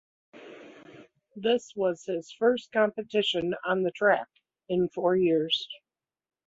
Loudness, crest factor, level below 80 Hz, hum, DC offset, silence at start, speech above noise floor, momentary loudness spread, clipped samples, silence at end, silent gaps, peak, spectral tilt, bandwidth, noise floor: -27 LUFS; 18 dB; -70 dBFS; none; under 0.1%; 0.35 s; 26 dB; 21 LU; under 0.1%; 0.7 s; none; -10 dBFS; -5 dB/octave; 8 kHz; -53 dBFS